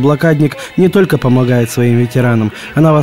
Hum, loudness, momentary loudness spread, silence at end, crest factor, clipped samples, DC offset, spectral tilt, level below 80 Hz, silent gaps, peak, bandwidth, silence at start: none; -12 LUFS; 4 LU; 0 s; 10 dB; under 0.1%; under 0.1%; -7.5 dB/octave; -42 dBFS; none; 0 dBFS; 16 kHz; 0 s